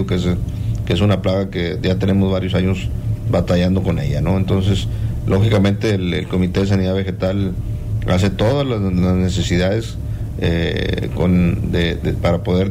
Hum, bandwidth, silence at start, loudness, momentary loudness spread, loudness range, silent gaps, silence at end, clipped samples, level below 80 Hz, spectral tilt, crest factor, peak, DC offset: none; 14.5 kHz; 0 s; -18 LUFS; 6 LU; 1 LU; none; 0 s; under 0.1%; -28 dBFS; -7 dB/octave; 12 dB; -4 dBFS; under 0.1%